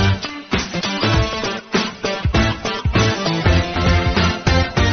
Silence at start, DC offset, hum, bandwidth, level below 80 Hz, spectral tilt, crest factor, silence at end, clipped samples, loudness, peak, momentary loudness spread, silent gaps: 0 s; under 0.1%; none; 6.8 kHz; -26 dBFS; -4 dB/octave; 14 dB; 0 s; under 0.1%; -18 LUFS; -4 dBFS; 6 LU; none